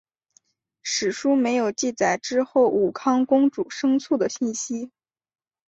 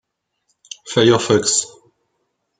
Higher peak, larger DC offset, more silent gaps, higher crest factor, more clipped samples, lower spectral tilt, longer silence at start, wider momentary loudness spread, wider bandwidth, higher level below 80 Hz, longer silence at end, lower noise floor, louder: second, -8 dBFS vs -2 dBFS; neither; neither; about the same, 16 dB vs 18 dB; neither; about the same, -3.5 dB/octave vs -3.5 dB/octave; about the same, 0.85 s vs 0.85 s; second, 8 LU vs 21 LU; second, 8.2 kHz vs 9.6 kHz; second, -68 dBFS vs -60 dBFS; second, 0.8 s vs 0.95 s; second, -64 dBFS vs -71 dBFS; second, -22 LUFS vs -16 LUFS